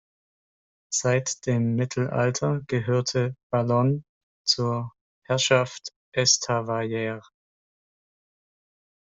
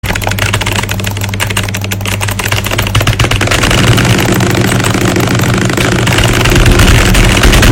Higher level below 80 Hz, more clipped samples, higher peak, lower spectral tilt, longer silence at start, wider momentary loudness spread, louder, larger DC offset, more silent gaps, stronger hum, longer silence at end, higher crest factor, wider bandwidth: second, -62 dBFS vs -16 dBFS; second, under 0.1% vs 0.5%; second, -6 dBFS vs 0 dBFS; about the same, -4 dB/octave vs -4 dB/octave; first, 0.9 s vs 0.05 s; first, 11 LU vs 7 LU; second, -25 LUFS vs -9 LUFS; neither; first, 3.43-3.50 s, 4.09-4.44 s, 5.01-5.22 s, 5.96-6.12 s vs none; neither; first, 1.8 s vs 0 s; first, 20 dB vs 8 dB; second, 8.2 kHz vs 17 kHz